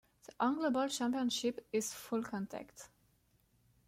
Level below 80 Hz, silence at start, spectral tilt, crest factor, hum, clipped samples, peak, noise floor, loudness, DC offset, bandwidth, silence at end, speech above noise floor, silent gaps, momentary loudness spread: -76 dBFS; 0.4 s; -3.5 dB/octave; 18 dB; none; under 0.1%; -20 dBFS; -73 dBFS; -37 LUFS; under 0.1%; 16.5 kHz; 1 s; 37 dB; none; 12 LU